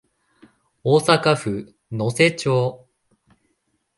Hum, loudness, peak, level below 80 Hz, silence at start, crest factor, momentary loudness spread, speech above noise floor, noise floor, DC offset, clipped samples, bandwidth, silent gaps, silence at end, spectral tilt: none; -20 LUFS; 0 dBFS; -58 dBFS; 0.85 s; 22 dB; 12 LU; 52 dB; -70 dBFS; under 0.1%; under 0.1%; 11.5 kHz; none; 1.2 s; -5 dB/octave